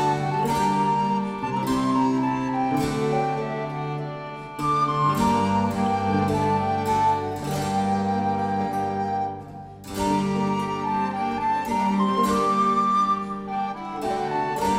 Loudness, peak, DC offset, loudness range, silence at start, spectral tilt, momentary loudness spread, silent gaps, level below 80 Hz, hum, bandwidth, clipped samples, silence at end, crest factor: -24 LUFS; -8 dBFS; under 0.1%; 3 LU; 0 s; -6 dB/octave; 8 LU; none; -50 dBFS; none; 16 kHz; under 0.1%; 0 s; 14 dB